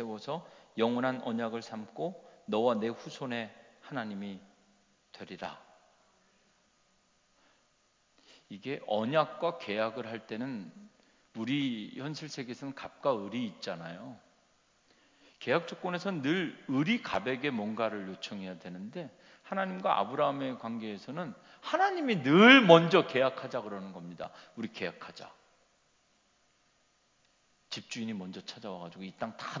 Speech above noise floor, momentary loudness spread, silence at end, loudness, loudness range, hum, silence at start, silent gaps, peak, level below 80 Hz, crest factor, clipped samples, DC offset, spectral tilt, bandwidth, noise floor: 40 dB; 16 LU; 0 s; -31 LUFS; 21 LU; none; 0 s; none; -4 dBFS; -78 dBFS; 28 dB; under 0.1%; under 0.1%; -5.5 dB/octave; 7.6 kHz; -71 dBFS